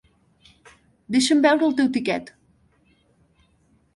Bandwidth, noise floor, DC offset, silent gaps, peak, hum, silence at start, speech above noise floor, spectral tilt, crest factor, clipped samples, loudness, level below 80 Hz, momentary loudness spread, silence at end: 11.5 kHz; -62 dBFS; under 0.1%; none; -6 dBFS; none; 1.1 s; 43 dB; -3.5 dB/octave; 18 dB; under 0.1%; -20 LUFS; -64 dBFS; 9 LU; 1.65 s